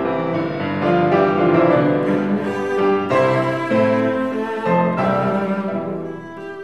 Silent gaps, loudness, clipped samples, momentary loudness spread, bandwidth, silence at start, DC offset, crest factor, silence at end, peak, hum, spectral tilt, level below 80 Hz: none; -18 LUFS; under 0.1%; 8 LU; 10.5 kHz; 0 s; 0.3%; 16 dB; 0 s; -2 dBFS; none; -8 dB/octave; -56 dBFS